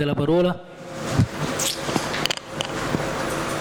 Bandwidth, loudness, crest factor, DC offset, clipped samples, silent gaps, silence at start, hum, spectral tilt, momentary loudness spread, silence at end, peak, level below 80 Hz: over 20 kHz; -24 LUFS; 18 dB; under 0.1%; under 0.1%; none; 0 s; none; -4.5 dB/octave; 7 LU; 0 s; -6 dBFS; -44 dBFS